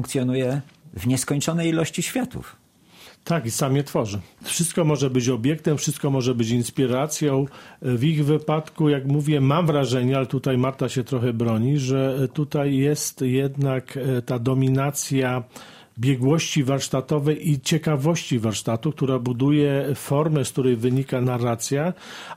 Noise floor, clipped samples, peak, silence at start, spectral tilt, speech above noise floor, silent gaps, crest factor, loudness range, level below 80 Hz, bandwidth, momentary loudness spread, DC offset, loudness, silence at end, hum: -49 dBFS; under 0.1%; -6 dBFS; 0 s; -6 dB/octave; 27 dB; none; 16 dB; 3 LU; -56 dBFS; 16 kHz; 6 LU; under 0.1%; -23 LUFS; 0 s; none